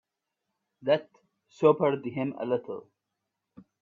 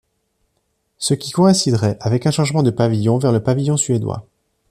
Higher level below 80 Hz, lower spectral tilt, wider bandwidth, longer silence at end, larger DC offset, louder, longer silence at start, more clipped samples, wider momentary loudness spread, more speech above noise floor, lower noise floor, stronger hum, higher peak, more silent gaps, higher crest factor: second, -74 dBFS vs -52 dBFS; first, -8 dB/octave vs -5.5 dB/octave; second, 7.2 kHz vs 14 kHz; first, 1.05 s vs 0.5 s; neither; second, -28 LUFS vs -17 LUFS; second, 0.8 s vs 1 s; neither; first, 14 LU vs 7 LU; first, 58 dB vs 52 dB; first, -85 dBFS vs -68 dBFS; neither; second, -8 dBFS vs -2 dBFS; neither; first, 22 dB vs 16 dB